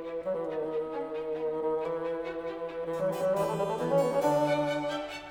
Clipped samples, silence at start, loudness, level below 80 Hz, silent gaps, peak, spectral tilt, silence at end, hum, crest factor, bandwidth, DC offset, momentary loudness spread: under 0.1%; 0 s; -31 LUFS; -64 dBFS; none; -14 dBFS; -6 dB/octave; 0 s; none; 16 dB; 18 kHz; under 0.1%; 9 LU